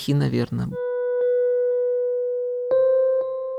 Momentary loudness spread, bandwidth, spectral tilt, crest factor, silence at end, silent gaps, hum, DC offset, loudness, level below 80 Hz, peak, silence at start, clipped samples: 7 LU; 12.5 kHz; -8 dB/octave; 12 dB; 0 s; none; none; under 0.1%; -22 LUFS; -54 dBFS; -10 dBFS; 0 s; under 0.1%